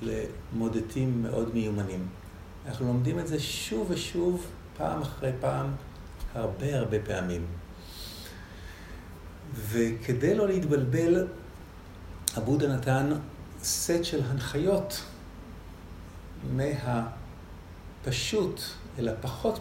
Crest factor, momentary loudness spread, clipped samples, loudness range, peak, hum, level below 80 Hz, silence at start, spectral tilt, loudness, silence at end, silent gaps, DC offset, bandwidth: 28 dB; 19 LU; under 0.1%; 6 LU; -4 dBFS; none; -48 dBFS; 0 s; -5.5 dB/octave; -30 LUFS; 0 s; none; under 0.1%; 16 kHz